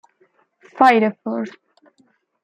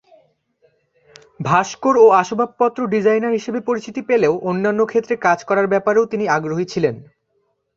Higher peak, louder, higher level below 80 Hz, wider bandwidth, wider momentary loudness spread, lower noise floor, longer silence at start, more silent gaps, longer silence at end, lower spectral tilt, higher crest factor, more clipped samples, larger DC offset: about the same, -2 dBFS vs -2 dBFS; about the same, -17 LUFS vs -17 LUFS; second, -70 dBFS vs -60 dBFS; first, 9.8 kHz vs 7.4 kHz; first, 14 LU vs 10 LU; second, -61 dBFS vs -67 dBFS; second, 0.75 s vs 1.4 s; neither; first, 0.95 s vs 0.75 s; about the same, -6 dB/octave vs -6 dB/octave; about the same, 20 dB vs 16 dB; neither; neither